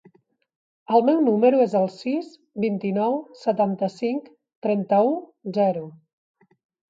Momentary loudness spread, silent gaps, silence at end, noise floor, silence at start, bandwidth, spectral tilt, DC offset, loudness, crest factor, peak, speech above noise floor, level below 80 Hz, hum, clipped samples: 12 LU; 4.56-4.62 s; 1 s; -59 dBFS; 0.9 s; 7.8 kHz; -8.5 dB/octave; under 0.1%; -23 LUFS; 18 dB; -6 dBFS; 37 dB; -76 dBFS; none; under 0.1%